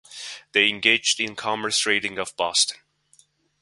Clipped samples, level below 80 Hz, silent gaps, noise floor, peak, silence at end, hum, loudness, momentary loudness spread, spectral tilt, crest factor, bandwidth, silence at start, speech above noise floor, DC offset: under 0.1%; -66 dBFS; none; -60 dBFS; 0 dBFS; 0.85 s; none; -21 LUFS; 10 LU; -0.5 dB/octave; 24 dB; 12 kHz; 0.1 s; 37 dB; under 0.1%